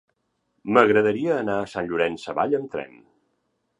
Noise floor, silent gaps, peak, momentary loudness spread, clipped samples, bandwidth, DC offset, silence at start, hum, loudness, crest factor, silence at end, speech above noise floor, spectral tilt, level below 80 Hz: -73 dBFS; none; 0 dBFS; 16 LU; under 0.1%; 10.5 kHz; under 0.1%; 0.65 s; none; -22 LUFS; 24 dB; 0.95 s; 51 dB; -6.5 dB/octave; -62 dBFS